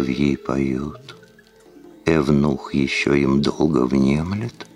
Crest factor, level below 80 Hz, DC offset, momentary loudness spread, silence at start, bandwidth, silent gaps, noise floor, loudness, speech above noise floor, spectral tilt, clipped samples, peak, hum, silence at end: 16 dB; -40 dBFS; under 0.1%; 9 LU; 0 s; 11 kHz; none; -50 dBFS; -20 LUFS; 30 dB; -6.5 dB/octave; under 0.1%; -4 dBFS; none; 0.1 s